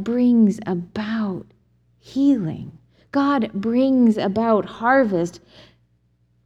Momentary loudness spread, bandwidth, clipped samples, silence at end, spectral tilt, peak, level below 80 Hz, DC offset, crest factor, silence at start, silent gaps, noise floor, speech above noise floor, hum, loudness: 13 LU; 8.4 kHz; under 0.1%; 1.1 s; -7.5 dB/octave; -4 dBFS; -58 dBFS; under 0.1%; 16 dB; 0 s; none; -63 dBFS; 43 dB; 60 Hz at -50 dBFS; -20 LUFS